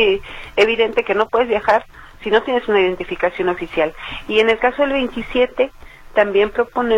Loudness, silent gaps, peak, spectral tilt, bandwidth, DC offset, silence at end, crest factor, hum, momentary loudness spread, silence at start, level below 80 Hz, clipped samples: -18 LUFS; none; -2 dBFS; -5 dB/octave; 10.5 kHz; under 0.1%; 0 s; 16 dB; none; 6 LU; 0 s; -42 dBFS; under 0.1%